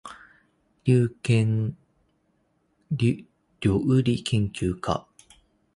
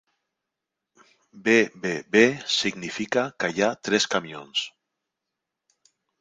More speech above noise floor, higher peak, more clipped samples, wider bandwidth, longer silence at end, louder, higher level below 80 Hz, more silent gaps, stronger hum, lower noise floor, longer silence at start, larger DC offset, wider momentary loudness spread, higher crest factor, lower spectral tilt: second, 46 dB vs 61 dB; second, -8 dBFS vs -4 dBFS; neither; first, 11.5 kHz vs 9.6 kHz; second, 0.75 s vs 1.55 s; about the same, -25 LUFS vs -23 LUFS; first, -48 dBFS vs -68 dBFS; neither; neither; second, -69 dBFS vs -85 dBFS; second, 0.05 s vs 1.35 s; neither; about the same, 10 LU vs 10 LU; about the same, 18 dB vs 22 dB; first, -7 dB/octave vs -3.5 dB/octave